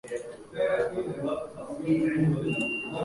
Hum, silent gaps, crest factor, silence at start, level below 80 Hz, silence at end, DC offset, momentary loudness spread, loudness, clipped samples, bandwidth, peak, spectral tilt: none; none; 16 dB; 0.05 s; -58 dBFS; 0 s; under 0.1%; 12 LU; -29 LUFS; under 0.1%; 11.5 kHz; -14 dBFS; -7 dB/octave